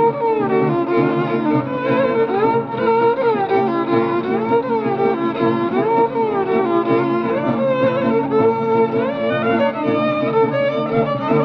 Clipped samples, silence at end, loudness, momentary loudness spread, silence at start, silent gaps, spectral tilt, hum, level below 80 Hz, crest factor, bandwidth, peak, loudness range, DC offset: under 0.1%; 0 s; -17 LUFS; 3 LU; 0 s; none; -9 dB/octave; none; -58 dBFS; 14 dB; 5.8 kHz; -4 dBFS; 1 LU; under 0.1%